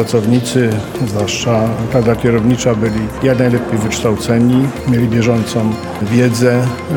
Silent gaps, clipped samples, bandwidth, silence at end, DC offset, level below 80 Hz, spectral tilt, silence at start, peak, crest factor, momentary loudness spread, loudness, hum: none; under 0.1%; 18 kHz; 0 s; under 0.1%; -36 dBFS; -6 dB/octave; 0 s; 0 dBFS; 12 dB; 5 LU; -14 LUFS; none